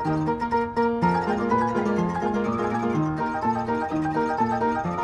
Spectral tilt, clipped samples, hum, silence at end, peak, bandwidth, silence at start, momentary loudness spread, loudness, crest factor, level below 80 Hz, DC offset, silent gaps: -7.5 dB/octave; under 0.1%; none; 0 s; -8 dBFS; 10 kHz; 0 s; 3 LU; -24 LUFS; 16 dB; -50 dBFS; under 0.1%; none